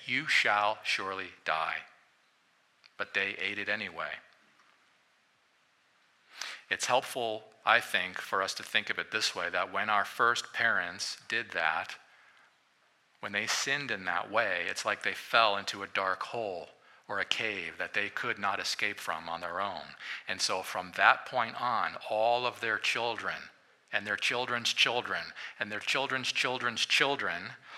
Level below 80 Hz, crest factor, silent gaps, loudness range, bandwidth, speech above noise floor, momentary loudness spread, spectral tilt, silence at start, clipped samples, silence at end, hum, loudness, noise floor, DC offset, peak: -80 dBFS; 26 dB; none; 7 LU; 15.5 kHz; 37 dB; 12 LU; -1.5 dB/octave; 0 s; under 0.1%; 0 s; none; -31 LUFS; -69 dBFS; under 0.1%; -8 dBFS